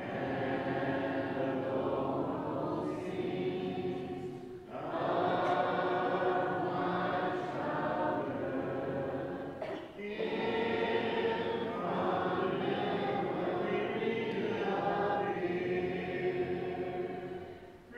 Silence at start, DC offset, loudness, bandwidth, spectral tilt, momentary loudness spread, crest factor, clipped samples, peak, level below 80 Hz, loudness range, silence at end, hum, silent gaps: 0 s; under 0.1%; -35 LUFS; 8.8 kHz; -7.5 dB/octave; 8 LU; 16 dB; under 0.1%; -20 dBFS; -66 dBFS; 3 LU; 0 s; none; none